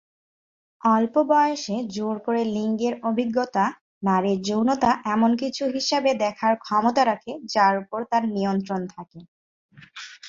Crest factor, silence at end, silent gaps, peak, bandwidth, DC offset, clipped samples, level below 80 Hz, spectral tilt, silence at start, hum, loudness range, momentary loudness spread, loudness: 18 dB; 0 s; 3.81-4.01 s, 9.28-9.69 s; -6 dBFS; 7.6 kHz; under 0.1%; under 0.1%; -64 dBFS; -5 dB/octave; 0.85 s; none; 2 LU; 9 LU; -23 LUFS